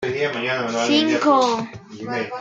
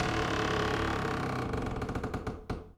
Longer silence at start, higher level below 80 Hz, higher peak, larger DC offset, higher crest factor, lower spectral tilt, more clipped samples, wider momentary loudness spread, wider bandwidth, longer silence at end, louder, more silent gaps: about the same, 0 s vs 0 s; second, -64 dBFS vs -44 dBFS; first, -4 dBFS vs -16 dBFS; neither; about the same, 16 dB vs 16 dB; second, -4 dB/octave vs -5.5 dB/octave; neither; first, 12 LU vs 8 LU; second, 9 kHz vs 17.5 kHz; about the same, 0 s vs 0.05 s; first, -20 LUFS vs -33 LUFS; neither